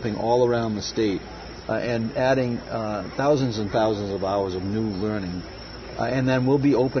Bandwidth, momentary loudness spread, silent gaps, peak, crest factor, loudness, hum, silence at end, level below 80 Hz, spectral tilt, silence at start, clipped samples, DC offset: 6.6 kHz; 11 LU; none; -8 dBFS; 16 dB; -24 LUFS; none; 0 s; -46 dBFS; -6.5 dB/octave; 0 s; under 0.1%; under 0.1%